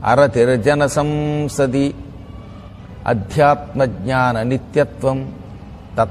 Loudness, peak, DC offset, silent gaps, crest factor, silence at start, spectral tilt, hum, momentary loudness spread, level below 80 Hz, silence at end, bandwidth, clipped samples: -17 LUFS; 0 dBFS; under 0.1%; none; 16 dB; 0 s; -6.5 dB/octave; none; 21 LU; -40 dBFS; 0 s; 13.5 kHz; under 0.1%